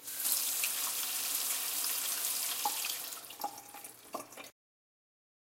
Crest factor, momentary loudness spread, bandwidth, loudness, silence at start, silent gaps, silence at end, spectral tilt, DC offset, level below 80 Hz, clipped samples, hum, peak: 24 dB; 17 LU; 17 kHz; -33 LUFS; 0 s; none; 1 s; 2 dB/octave; under 0.1%; -84 dBFS; under 0.1%; none; -12 dBFS